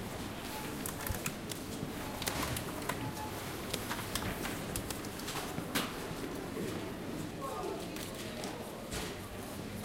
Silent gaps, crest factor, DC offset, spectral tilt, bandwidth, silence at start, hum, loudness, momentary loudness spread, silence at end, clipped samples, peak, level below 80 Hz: none; 24 dB; under 0.1%; -4 dB/octave; 17 kHz; 0 s; none; -39 LUFS; 5 LU; 0 s; under 0.1%; -14 dBFS; -52 dBFS